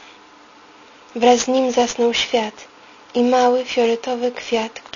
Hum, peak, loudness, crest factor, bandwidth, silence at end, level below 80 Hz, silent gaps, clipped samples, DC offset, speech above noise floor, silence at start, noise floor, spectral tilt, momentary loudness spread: none; 0 dBFS; -18 LUFS; 18 dB; 7.4 kHz; 0.15 s; -58 dBFS; none; under 0.1%; under 0.1%; 28 dB; 1.15 s; -46 dBFS; -2.5 dB/octave; 8 LU